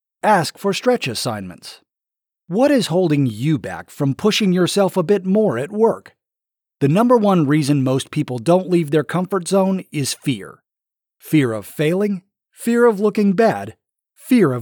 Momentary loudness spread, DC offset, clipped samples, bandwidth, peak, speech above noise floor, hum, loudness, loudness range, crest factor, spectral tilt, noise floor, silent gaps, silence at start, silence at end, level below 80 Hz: 10 LU; under 0.1%; under 0.1%; 20 kHz; -4 dBFS; 70 dB; none; -18 LUFS; 3 LU; 14 dB; -6 dB/octave; -87 dBFS; none; 0.25 s; 0 s; -66 dBFS